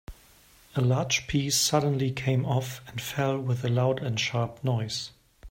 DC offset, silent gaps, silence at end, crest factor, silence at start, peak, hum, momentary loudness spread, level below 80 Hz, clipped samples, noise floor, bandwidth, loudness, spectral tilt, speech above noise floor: under 0.1%; none; 0 s; 18 dB; 0.1 s; -10 dBFS; none; 10 LU; -54 dBFS; under 0.1%; -57 dBFS; 16.5 kHz; -27 LUFS; -4.5 dB/octave; 30 dB